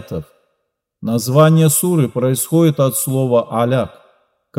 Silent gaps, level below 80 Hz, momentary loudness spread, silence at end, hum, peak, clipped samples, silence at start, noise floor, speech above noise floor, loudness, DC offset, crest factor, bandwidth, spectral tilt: none; -56 dBFS; 14 LU; 0.7 s; none; 0 dBFS; under 0.1%; 0 s; -72 dBFS; 58 dB; -15 LUFS; under 0.1%; 16 dB; 16 kHz; -6 dB/octave